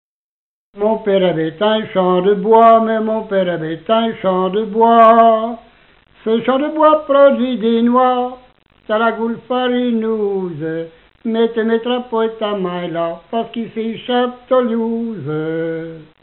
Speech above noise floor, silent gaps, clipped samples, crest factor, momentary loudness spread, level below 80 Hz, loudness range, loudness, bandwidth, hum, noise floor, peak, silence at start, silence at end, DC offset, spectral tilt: 35 dB; none; under 0.1%; 16 dB; 13 LU; -56 dBFS; 7 LU; -15 LUFS; 4.2 kHz; none; -50 dBFS; 0 dBFS; 0.75 s; 0.2 s; under 0.1%; -9.5 dB/octave